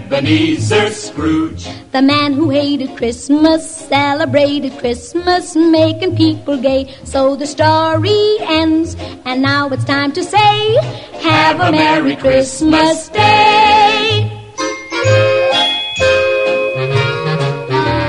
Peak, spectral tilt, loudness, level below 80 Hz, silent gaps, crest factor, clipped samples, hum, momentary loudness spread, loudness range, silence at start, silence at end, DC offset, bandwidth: 0 dBFS; -5 dB/octave; -13 LUFS; -40 dBFS; none; 12 dB; under 0.1%; none; 8 LU; 3 LU; 0 s; 0 s; under 0.1%; 11 kHz